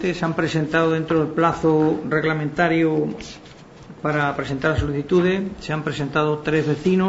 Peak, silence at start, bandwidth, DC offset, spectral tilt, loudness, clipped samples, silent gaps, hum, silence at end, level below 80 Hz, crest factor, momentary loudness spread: -4 dBFS; 0 s; 8 kHz; under 0.1%; -7 dB/octave; -21 LUFS; under 0.1%; none; none; 0 s; -44 dBFS; 18 dB; 8 LU